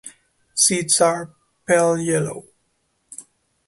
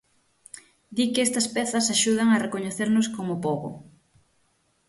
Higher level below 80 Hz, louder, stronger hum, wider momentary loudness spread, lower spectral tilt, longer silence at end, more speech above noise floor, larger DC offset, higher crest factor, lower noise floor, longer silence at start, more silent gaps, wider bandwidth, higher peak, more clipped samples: about the same, -64 dBFS vs -66 dBFS; first, -19 LUFS vs -24 LUFS; neither; about the same, 23 LU vs 24 LU; about the same, -3 dB/octave vs -3.5 dB/octave; second, 0.45 s vs 1.05 s; first, 50 dB vs 44 dB; neither; about the same, 20 dB vs 18 dB; about the same, -69 dBFS vs -68 dBFS; second, 0.05 s vs 0.55 s; neither; about the same, 12 kHz vs 11.5 kHz; first, -2 dBFS vs -8 dBFS; neither